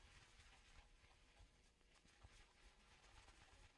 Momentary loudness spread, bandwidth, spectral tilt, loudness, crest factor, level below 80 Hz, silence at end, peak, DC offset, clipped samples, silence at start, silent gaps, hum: 1 LU; 11 kHz; -3 dB/octave; -69 LUFS; 18 dB; -72 dBFS; 0 s; -52 dBFS; under 0.1%; under 0.1%; 0 s; none; none